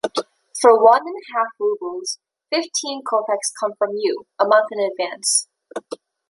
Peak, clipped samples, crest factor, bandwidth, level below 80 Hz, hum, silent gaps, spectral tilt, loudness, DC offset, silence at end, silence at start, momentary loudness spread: 0 dBFS; under 0.1%; 20 dB; 11.5 kHz; -72 dBFS; none; none; -1 dB/octave; -19 LUFS; under 0.1%; 0.35 s; 0.05 s; 18 LU